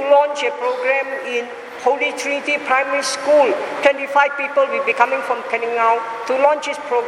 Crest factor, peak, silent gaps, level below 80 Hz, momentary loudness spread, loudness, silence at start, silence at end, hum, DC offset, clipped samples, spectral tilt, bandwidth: 18 dB; 0 dBFS; none; -72 dBFS; 7 LU; -18 LUFS; 0 s; 0 s; none; under 0.1%; under 0.1%; -1.5 dB/octave; 12.5 kHz